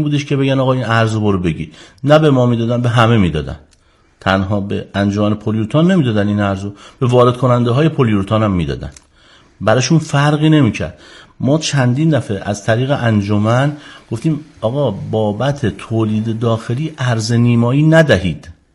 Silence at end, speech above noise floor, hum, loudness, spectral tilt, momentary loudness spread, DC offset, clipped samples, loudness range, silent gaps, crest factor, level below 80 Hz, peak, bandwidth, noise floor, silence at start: 0.25 s; 38 dB; none; -15 LUFS; -6.5 dB/octave; 10 LU; under 0.1%; under 0.1%; 3 LU; none; 14 dB; -42 dBFS; 0 dBFS; 11.5 kHz; -52 dBFS; 0 s